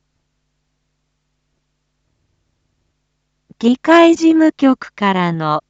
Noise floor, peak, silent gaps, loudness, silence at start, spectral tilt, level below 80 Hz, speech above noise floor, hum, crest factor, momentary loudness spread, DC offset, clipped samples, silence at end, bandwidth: -69 dBFS; 0 dBFS; none; -13 LUFS; 3.6 s; -6 dB/octave; -64 dBFS; 57 dB; none; 16 dB; 8 LU; under 0.1%; under 0.1%; 0.1 s; 8 kHz